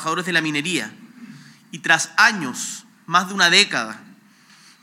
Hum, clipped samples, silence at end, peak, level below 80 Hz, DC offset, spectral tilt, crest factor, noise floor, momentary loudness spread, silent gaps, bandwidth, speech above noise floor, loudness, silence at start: none; under 0.1%; 0.7 s; 0 dBFS; -82 dBFS; under 0.1%; -2 dB/octave; 22 dB; -51 dBFS; 19 LU; none; 16.5 kHz; 31 dB; -18 LUFS; 0 s